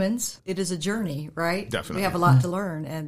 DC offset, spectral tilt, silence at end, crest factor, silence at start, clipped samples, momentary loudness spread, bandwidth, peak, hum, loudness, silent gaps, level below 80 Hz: 0.3%; -5.5 dB/octave; 0 s; 18 dB; 0 s; under 0.1%; 10 LU; 15.5 kHz; -6 dBFS; none; -25 LUFS; none; -54 dBFS